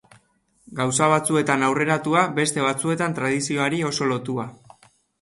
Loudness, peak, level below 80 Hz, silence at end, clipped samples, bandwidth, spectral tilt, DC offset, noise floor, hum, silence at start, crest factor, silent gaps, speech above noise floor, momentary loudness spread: -22 LUFS; -4 dBFS; -62 dBFS; 0.7 s; under 0.1%; 12 kHz; -4.5 dB/octave; under 0.1%; -63 dBFS; none; 0.7 s; 20 dB; none; 41 dB; 8 LU